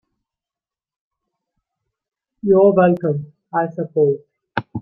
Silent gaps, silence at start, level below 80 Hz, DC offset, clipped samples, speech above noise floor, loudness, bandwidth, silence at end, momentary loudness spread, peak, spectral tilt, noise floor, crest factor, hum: none; 2.45 s; -62 dBFS; under 0.1%; under 0.1%; over 74 dB; -18 LUFS; 4.7 kHz; 0 s; 15 LU; -2 dBFS; -11 dB/octave; under -90 dBFS; 18 dB; none